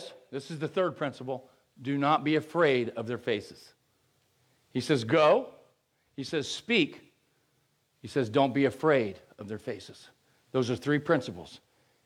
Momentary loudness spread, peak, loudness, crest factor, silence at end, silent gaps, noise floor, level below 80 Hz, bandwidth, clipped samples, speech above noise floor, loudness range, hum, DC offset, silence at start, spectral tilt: 16 LU; -12 dBFS; -29 LUFS; 18 dB; 0.5 s; none; -72 dBFS; -72 dBFS; 13.5 kHz; under 0.1%; 44 dB; 2 LU; none; under 0.1%; 0 s; -5.5 dB/octave